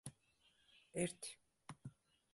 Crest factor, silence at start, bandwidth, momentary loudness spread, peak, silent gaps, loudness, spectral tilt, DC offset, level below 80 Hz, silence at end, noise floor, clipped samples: 24 dB; 0.05 s; 12 kHz; 21 LU; -28 dBFS; none; -48 LUFS; -4.5 dB/octave; under 0.1%; -78 dBFS; 0.4 s; -77 dBFS; under 0.1%